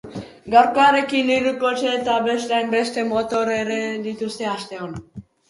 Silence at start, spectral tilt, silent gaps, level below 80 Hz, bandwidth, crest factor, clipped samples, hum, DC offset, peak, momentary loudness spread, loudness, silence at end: 0.05 s; -4 dB/octave; none; -56 dBFS; 11.5 kHz; 20 dB; under 0.1%; none; under 0.1%; 0 dBFS; 16 LU; -20 LUFS; 0.3 s